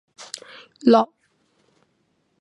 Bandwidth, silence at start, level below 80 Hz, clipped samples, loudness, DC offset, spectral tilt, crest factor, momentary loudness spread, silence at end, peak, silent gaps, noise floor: 11.5 kHz; 0.85 s; -82 dBFS; under 0.1%; -19 LUFS; under 0.1%; -5 dB/octave; 22 dB; 20 LU; 1.35 s; -2 dBFS; none; -68 dBFS